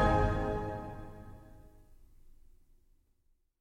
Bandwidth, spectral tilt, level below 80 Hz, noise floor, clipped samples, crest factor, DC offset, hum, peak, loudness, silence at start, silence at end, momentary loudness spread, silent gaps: 10.5 kHz; -7.5 dB/octave; -42 dBFS; -72 dBFS; under 0.1%; 22 dB; under 0.1%; none; -14 dBFS; -34 LUFS; 0 s; 1.3 s; 24 LU; none